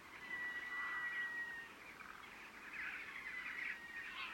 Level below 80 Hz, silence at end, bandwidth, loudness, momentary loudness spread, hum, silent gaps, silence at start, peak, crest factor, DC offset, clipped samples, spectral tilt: -78 dBFS; 0 s; 16.5 kHz; -45 LUFS; 12 LU; none; none; 0 s; -34 dBFS; 14 dB; under 0.1%; under 0.1%; -1.5 dB/octave